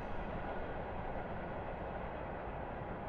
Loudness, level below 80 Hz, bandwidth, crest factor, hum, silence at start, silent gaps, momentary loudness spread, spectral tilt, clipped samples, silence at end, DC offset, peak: -43 LUFS; -50 dBFS; 5.2 kHz; 12 dB; none; 0 s; none; 1 LU; -9 dB/octave; under 0.1%; 0 s; under 0.1%; -30 dBFS